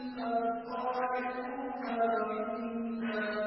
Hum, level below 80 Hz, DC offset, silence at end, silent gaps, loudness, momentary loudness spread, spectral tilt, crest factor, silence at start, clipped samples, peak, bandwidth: none; -70 dBFS; under 0.1%; 0 s; none; -34 LUFS; 6 LU; -3 dB/octave; 14 dB; 0 s; under 0.1%; -20 dBFS; 5.6 kHz